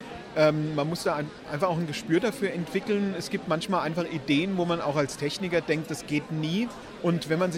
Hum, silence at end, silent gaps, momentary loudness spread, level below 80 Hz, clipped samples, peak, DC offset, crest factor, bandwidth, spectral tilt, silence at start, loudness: none; 0 s; none; 6 LU; -60 dBFS; under 0.1%; -10 dBFS; under 0.1%; 18 dB; 16 kHz; -5.5 dB/octave; 0 s; -28 LUFS